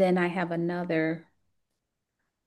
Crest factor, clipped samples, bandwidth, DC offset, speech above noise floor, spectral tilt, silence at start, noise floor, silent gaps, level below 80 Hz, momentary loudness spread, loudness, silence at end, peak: 18 dB; under 0.1%; 11.5 kHz; under 0.1%; 56 dB; -8 dB/octave; 0 s; -83 dBFS; none; -74 dBFS; 6 LU; -29 LUFS; 1.25 s; -12 dBFS